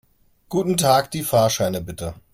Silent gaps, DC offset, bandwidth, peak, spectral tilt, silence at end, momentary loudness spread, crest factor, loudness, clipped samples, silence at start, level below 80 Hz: none; under 0.1%; 16.5 kHz; -4 dBFS; -4.5 dB/octave; 0.15 s; 12 LU; 18 dB; -20 LUFS; under 0.1%; 0.5 s; -50 dBFS